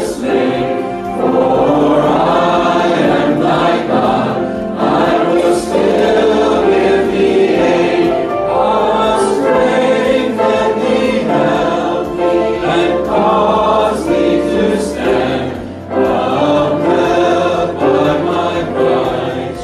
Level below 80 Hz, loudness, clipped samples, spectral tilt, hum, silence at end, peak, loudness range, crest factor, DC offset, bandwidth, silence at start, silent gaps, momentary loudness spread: -38 dBFS; -13 LUFS; under 0.1%; -6 dB/octave; none; 0 s; -2 dBFS; 2 LU; 10 dB; under 0.1%; 12.5 kHz; 0 s; none; 5 LU